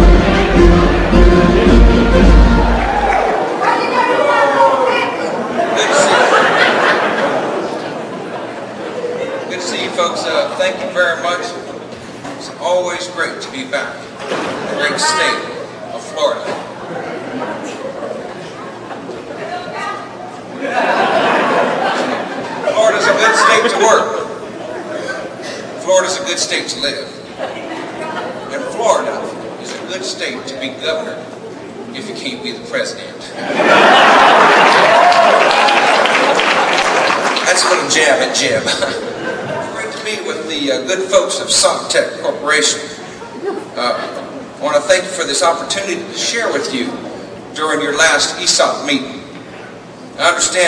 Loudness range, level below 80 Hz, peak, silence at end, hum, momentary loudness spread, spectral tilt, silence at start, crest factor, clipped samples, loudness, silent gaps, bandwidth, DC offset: 11 LU; -24 dBFS; 0 dBFS; 0 s; none; 17 LU; -3.5 dB/octave; 0 s; 14 dB; 0.1%; -13 LUFS; none; 11 kHz; under 0.1%